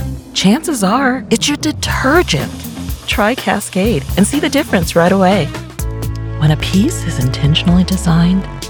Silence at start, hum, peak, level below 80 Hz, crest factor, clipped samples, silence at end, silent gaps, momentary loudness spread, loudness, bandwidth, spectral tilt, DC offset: 0 s; none; 0 dBFS; -26 dBFS; 14 dB; under 0.1%; 0 s; none; 10 LU; -14 LUFS; over 20 kHz; -5 dB/octave; under 0.1%